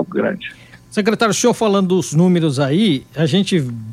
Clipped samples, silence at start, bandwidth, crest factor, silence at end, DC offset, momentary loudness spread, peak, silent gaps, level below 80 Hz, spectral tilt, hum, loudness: under 0.1%; 0 s; 15 kHz; 14 dB; 0 s; under 0.1%; 7 LU; -2 dBFS; none; -56 dBFS; -5.5 dB/octave; none; -16 LUFS